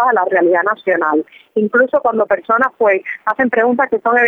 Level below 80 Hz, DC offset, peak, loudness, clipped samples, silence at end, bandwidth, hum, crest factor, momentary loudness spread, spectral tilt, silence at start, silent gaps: -60 dBFS; under 0.1%; -2 dBFS; -15 LUFS; under 0.1%; 0 s; 6.4 kHz; none; 14 dB; 5 LU; -8 dB/octave; 0 s; none